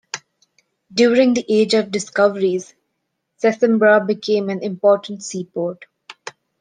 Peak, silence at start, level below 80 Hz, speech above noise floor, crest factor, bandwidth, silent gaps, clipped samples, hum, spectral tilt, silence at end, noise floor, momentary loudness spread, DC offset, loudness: -2 dBFS; 0.15 s; -68 dBFS; 58 dB; 16 dB; 9.8 kHz; none; under 0.1%; none; -4.5 dB/octave; 0.3 s; -74 dBFS; 18 LU; under 0.1%; -18 LUFS